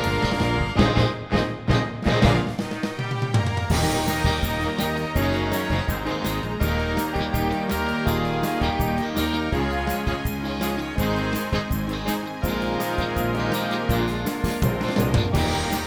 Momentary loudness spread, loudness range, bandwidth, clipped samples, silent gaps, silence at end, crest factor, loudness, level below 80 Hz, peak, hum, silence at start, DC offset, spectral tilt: 5 LU; 3 LU; over 20 kHz; under 0.1%; none; 0 s; 18 dB; -24 LUFS; -32 dBFS; -4 dBFS; none; 0 s; under 0.1%; -5.5 dB/octave